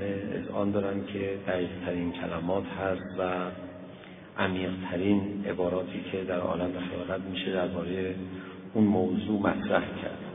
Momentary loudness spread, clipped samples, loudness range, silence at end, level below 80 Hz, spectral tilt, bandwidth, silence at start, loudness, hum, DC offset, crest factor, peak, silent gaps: 10 LU; under 0.1%; 3 LU; 0 s; -60 dBFS; -10.5 dB/octave; 3.8 kHz; 0 s; -31 LUFS; none; under 0.1%; 20 dB; -10 dBFS; none